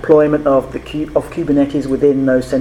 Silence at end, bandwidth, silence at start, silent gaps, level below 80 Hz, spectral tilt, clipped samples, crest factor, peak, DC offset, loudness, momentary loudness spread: 0 s; 12 kHz; 0 s; none; -38 dBFS; -7.5 dB/octave; under 0.1%; 14 dB; 0 dBFS; under 0.1%; -15 LUFS; 8 LU